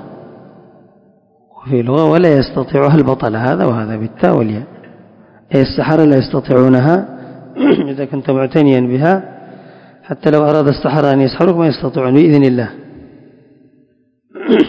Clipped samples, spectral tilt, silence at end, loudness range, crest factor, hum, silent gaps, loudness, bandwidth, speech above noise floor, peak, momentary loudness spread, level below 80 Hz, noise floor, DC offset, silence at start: 0.7%; -9.5 dB/octave; 0 s; 3 LU; 14 dB; none; none; -12 LUFS; 6.6 kHz; 44 dB; 0 dBFS; 11 LU; -44 dBFS; -55 dBFS; under 0.1%; 0 s